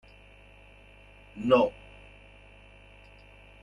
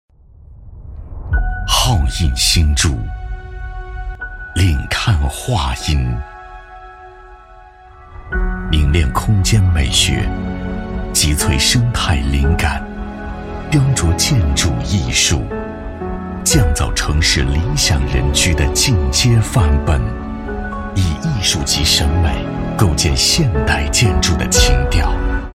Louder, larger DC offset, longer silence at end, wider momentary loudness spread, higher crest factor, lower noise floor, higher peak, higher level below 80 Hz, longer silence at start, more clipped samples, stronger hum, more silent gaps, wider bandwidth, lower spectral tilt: second, -26 LUFS vs -15 LUFS; neither; first, 1.9 s vs 0 s; first, 28 LU vs 15 LU; first, 24 dB vs 16 dB; first, -54 dBFS vs -41 dBFS; second, -8 dBFS vs 0 dBFS; second, -56 dBFS vs -22 dBFS; first, 1.35 s vs 0.5 s; neither; first, 50 Hz at -55 dBFS vs none; neither; second, 10 kHz vs 16 kHz; first, -7 dB/octave vs -4 dB/octave